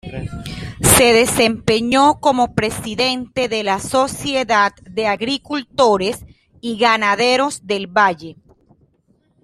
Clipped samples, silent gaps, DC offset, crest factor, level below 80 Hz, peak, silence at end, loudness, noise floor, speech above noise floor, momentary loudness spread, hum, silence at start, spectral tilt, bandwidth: under 0.1%; none; under 0.1%; 18 dB; -42 dBFS; 0 dBFS; 1.1 s; -16 LUFS; -60 dBFS; 43 dB; 15 LU; none; 0.05 s; -3 dB/octave; 15.5 kHz